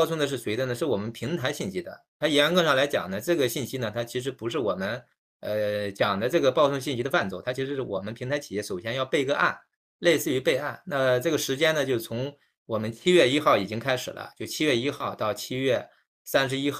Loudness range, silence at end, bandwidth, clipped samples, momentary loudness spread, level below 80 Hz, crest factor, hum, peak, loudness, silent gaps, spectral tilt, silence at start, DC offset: 3 LU; 0 s; 16 kHz; under 0.1%; 11 LU; -66 dBFS; 20 dB; none; -6 dBFS; -26 LUFS; 2.08-2.20 s, 5.18-5.40 s, 9.76-9.99 s, 12.57-12.66 s, 16.07-16.25 s; -4.5 dB/octave; 0 s; under 0.1%